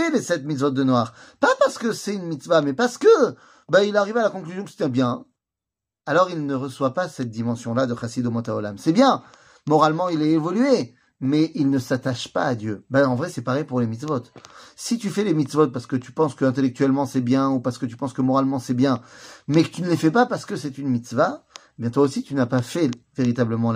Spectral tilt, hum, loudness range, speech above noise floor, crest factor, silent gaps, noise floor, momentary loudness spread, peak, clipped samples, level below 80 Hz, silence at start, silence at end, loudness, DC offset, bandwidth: -6 dB/octave; none; 4 LU; 66 dB; 18 dB; none; -87 dBFS; 10 LU; -4 dBFS; under 0.1%; -64 dBFS; 0 s; 0 s; -22 LUFS; under 0.1%; 15.5 kHz